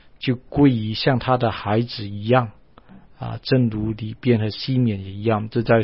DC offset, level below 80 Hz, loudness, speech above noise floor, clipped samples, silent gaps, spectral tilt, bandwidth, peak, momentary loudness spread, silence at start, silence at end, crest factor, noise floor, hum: 0.3%; -46 dBFS; -21 LUFS; 28 dB; under 0.1%; none; -11.5 dB/octave; 5.8 kHz; -2 dBFS; 10 LU; 0.2 s; 0 s; 20 dB; -48 dBFS; none